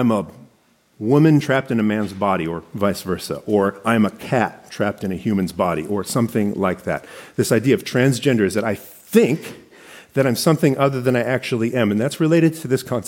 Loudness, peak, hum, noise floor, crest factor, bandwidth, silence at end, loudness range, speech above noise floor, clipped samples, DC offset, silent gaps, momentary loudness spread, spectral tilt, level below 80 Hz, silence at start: -19 LUFS; -2 dBFS; none; -58 dBFS; 18 dB; 17 kHz; 0 s; 2 LU; 39 dB; under 0.1%; under 0.1%; none; 9 LU; -6 dB/octave; -56 dBFS; 0 s